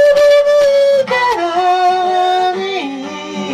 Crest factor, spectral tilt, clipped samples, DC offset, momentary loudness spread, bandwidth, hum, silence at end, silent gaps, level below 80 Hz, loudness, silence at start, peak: 8 dB; -3.5 dB/octave; under 0.1%; under 0.1%; 13 LU; 13 kHz; none; 0 s; none; -52 dBFS; -12 LUFS; 0 s; -4 dBFS